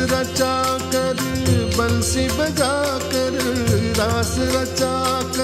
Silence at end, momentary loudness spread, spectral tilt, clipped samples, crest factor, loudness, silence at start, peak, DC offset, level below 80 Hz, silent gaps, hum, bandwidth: 0 s; 2 LU; -4.5 dB/octave; under 0.1%; 14 dB; -20 LUFS; 0 s; -4 dBFS; under 0.1%; -34 dBFS; none; none; 16 kHz